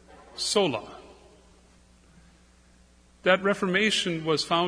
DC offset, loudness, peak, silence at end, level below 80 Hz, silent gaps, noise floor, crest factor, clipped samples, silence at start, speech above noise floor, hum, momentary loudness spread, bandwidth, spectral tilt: under 0.1%; -25 LUFS; -6 dBFS; 0 s; -60 dBFS; none; -58 dBFS; 24 dB; under 0.1%; 0.35 s; 33 dB; 60 Hz at -55 dBFS; 19 LU; 11 kHz; -3.5 dB/octave